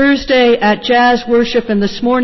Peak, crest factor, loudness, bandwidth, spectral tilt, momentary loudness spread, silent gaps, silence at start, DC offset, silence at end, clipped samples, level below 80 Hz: -2 dBFS; 8 dB; -12 LUFS; 6.2 kHz; -5.5 dB/octave; 4 LU; none; 0 s; under 0.1%; 0 s; under 0.1%; -40 dBFS